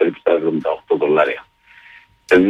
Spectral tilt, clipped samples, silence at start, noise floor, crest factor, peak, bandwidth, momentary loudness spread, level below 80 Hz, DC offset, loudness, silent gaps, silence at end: -6.5 dB/octave; under 0.1%; 0 s; -47 dBFS; 14 dB; -2 dBFS; 10.5 kHz; 6 LU; -56 dBFS; under 0.1%; -18 LUFS; none; 0 s